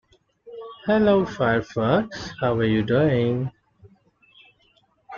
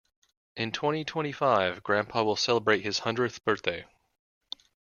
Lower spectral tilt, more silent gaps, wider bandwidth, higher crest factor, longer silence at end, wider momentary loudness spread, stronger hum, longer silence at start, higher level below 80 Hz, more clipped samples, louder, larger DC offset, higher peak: first, -7.5 dB/octave vs -4 dB/octave; neither; about the same, 7.2 kHz vs 7.4 kHz; second, 16 dB vs 22 dB; second, 0 s vs 1.05 s; second, 14 LU vs 18 LU; neither; about the same, 0.45 s vs 0.55 s; first, -52 dBFS vs -68 dBFS; neither; first, -22 LUFS vs -28 LUFS; neither; about the same, -6 dBFS vs -8 dBFS